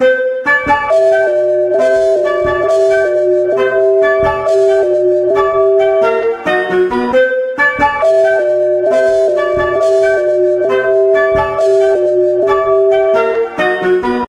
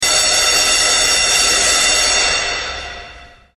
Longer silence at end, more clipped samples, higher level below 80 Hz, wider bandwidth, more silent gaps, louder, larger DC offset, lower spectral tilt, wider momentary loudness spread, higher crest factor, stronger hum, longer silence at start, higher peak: second, 0.05 s vs 0.35 s; neither; about the same, -42 dBFS vs -38 dBFS; second, 10 kHz vs 14 kHz; neither; about the same, -11 LUFS vs -11 LUFS; neither; first, -5.5 dB/octave vs 1 dB/octave; second, 3 LU vs 13 LU; about the same, 10 dB vs 14 dB; neither; about the same, 0 s vs 0 s; about the same, 0 dBFS vs 0 dBFS